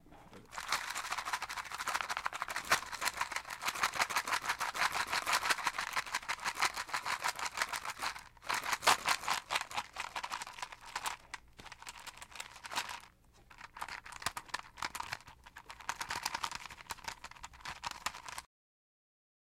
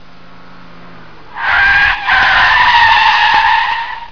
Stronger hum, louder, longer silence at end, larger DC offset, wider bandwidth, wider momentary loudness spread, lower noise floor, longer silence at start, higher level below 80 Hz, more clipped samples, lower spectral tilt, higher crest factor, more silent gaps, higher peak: neither; second, -37 LUFS vs -9 LUFS; first, 1 s vs 0.05 s; second, under 0.1% vs 2%; first, 16.5 kHz vs 5.4 kHz; first, 16 LU vs 8 LU; first, -62 dBFS vs -39 dBFS; second, 0.05 s vs 1.3 s; second, -64 dBFS vs -36 dBFS; neither; second, 0 dB/octave vs -1.5 dB/octave; first, 28 dB vs 12 dB; neither; second, -12 dBFS vs 0 dBFS